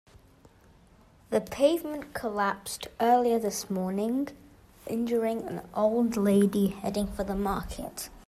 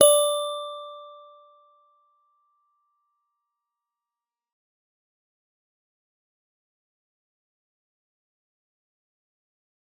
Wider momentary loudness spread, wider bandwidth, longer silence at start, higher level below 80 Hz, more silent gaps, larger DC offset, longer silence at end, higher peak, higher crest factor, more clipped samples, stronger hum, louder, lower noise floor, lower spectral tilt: second, 12 LU vs 25 LU; second, 15.5 kHz vs 18 kHz; first, 1.3 s vs 0 s; first, -50 dBFS vs -88 dBFS; neither; neither; second, 0.1 s vs 8.85 s; second, -12 dBFS vs -2 dBFS; second, 18 dB vs 30 dB; neither; neither; second, -29 LUFS vs -23 LUFS; second, -58 dBFS vs under -90 dBFS; first, -5.5 dB/octave vs 0.5 dB/octave